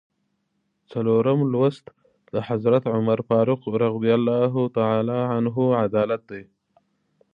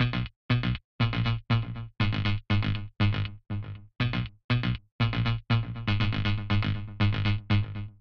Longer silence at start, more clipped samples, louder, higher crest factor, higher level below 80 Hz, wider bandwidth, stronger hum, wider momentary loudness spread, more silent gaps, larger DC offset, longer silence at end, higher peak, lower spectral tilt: first, 0.9 s vs 0 s; neither; first, -22 LUFS vs -29 LUFS; about the same, 16 dB vs 16 dB; second, -64 dBFS vs -40 dBFS; second, 5.2 kHz vs 6 kHz; neither; about the same, 9 LU vs 7 LU; second, none vs 0.36-0.49 s, 0.84-0.99 s, 4.44-4.49 s, 4.92-4.99 s; neither; first, 0.9 s vs 0.1 s; first, -6 dBFS vs -12 dBFS; first, -10 dB/octave vs -8 dB/octave